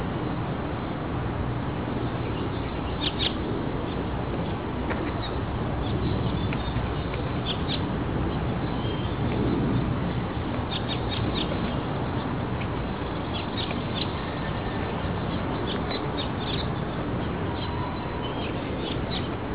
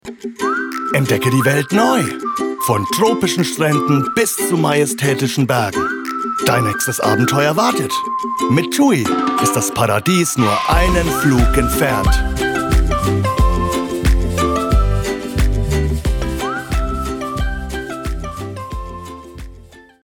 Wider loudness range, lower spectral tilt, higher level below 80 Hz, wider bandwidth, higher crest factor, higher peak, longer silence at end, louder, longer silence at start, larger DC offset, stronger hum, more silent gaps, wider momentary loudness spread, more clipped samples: second, 2 LU vs 6 LU; first, -10.5 dB/octave vs -5 dB/octave; second, -38 dBFS vs -24 dBFS; second, 4 kHz vs 19 kHz; about the same, 14 dB vs 14 dB; second, -12 dBFS vs -2 dBFS; second, 0 s vs 0.25 s; second, -29 LUFS vs -16 LUFS; about the same, 0 s vs 0.05 s; first, 0.4% vs under 0.1%; neither; neither; second, 4 LU vs 10 LU; neither